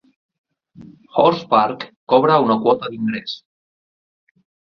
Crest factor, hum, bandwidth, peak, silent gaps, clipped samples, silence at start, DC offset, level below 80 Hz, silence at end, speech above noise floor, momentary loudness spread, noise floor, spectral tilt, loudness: 18 dB; none; 6.4 kHz; -2 dBFS; 1.96-2.07 s; under 0.1%; 0.8 s; under 0.1%; -64 dBFS; 1.4 s; over 73 dB; 14 LU; under -90 dBFS; -7.5 dB/octave; -17 LUFS